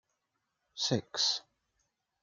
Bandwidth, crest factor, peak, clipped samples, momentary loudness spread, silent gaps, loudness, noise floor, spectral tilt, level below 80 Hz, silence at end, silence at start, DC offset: 12 kHz; 22 dB; -16 dBFS; under 0.1%; 9 LU; none; -32 LUFS; -83 dBFS; -3 dB/octave; -78 dBFS; 0.8 s; 0.75 s; under 0.1%